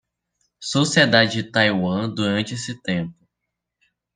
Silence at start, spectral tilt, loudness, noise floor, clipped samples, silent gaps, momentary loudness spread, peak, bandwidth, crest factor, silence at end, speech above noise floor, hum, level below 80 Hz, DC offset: 0.6 s; -4.5 dB/octave; -20 LUFS; -81 dBFS; under 0.1%; none; 13 LU; -2 dBFS; 10 kHz; 20 dB; 1.05 s; 61 dB; none; -62 dBFS; under 0.1%